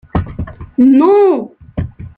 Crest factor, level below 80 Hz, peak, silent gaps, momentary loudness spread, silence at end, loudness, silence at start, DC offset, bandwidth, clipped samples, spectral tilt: 12 dB; -32 dBFS; -2 dBFS; none; 17 LU; 0.1 s; -11 LUFS; 0.15 s; under 0.1%; 4.5 kHz; under 0.1%; -11 dB/octave